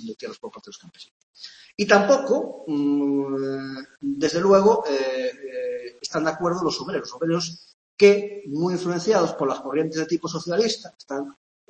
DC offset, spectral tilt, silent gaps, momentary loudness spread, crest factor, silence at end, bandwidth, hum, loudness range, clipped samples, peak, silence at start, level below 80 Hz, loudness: under 0.1%; -5 dB/octave; 1.11-1.34 s, 7.74-7.97 s; 19 LU; 22 dB; 0.4 s; 8.6 kHz; none; 3 LU; under 0.1%; -2 dBFS; 0 s; -64 dBFS; -23 LUFS